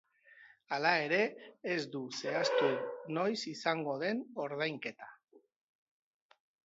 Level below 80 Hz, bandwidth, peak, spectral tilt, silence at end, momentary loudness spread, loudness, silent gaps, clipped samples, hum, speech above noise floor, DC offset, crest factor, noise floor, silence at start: -88 dBFS; 7.6 kHz; -14 dBFS; -2.5 dB/octave; 1.25 s; 11 LU; -35 LUFS; 5.24-5.28 s; under 0.1%; none; 26 dB; under 0.1%; 22 dB; -61 dBFS; 0.3 s